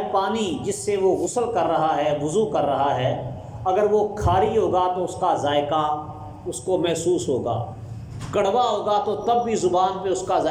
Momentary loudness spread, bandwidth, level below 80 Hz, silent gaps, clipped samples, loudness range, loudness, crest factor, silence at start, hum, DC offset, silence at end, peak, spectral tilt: 9 LU; 15.5 kHz; -46 dBFS; none; under 0.1%; 3 LU; -22 LUFS; 14 dB; 0 s; none; under 0.1%; 0 s; -8 dBFS; -5.5 dB/octave